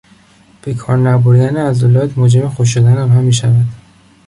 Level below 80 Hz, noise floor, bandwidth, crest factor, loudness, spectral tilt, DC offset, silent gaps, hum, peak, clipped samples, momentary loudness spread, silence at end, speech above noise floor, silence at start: -44 dBFS; -46 dBFS; 11 kHz; 10 dB; -11 LUFS; -7 dB/octave; under 0.1%; none; none; -2 dBFS; under 0.1%; 9 LU; 0.5 s; 36 dB; 0.65 s